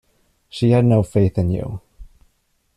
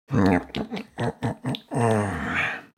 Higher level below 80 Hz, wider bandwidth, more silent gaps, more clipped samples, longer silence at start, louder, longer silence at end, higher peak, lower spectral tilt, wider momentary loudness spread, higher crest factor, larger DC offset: about the same, -44 dBFS vs -48 dBFS; second, 11 kHz vs 15 kHz; neither; neither; first, 0.55 s vs 0.1 s; first, -18 LUFS vs -26 LUFS; first, 0.7 s vs 0.1 s; about the same, -4 dBFS vs -6 dBFS; first, -8.5 dB/octave vs -6.5 dB/octave; first, 18 LU vs 10 LU; about the same, 16 dB vs 18 dB; neither